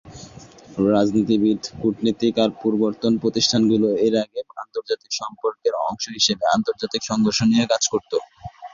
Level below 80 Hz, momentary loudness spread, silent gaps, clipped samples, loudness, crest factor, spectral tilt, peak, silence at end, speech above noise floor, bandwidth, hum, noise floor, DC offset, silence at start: -56 dBFS; 12 LU; none; under 0.1%; -21 LUFS; 16 dB; -4.5 dB/octave; -4 dBFS; 0.05 s; 23 dB; 7.4 kHz; none; -43 dBFS; under 0.1%; 0.05 s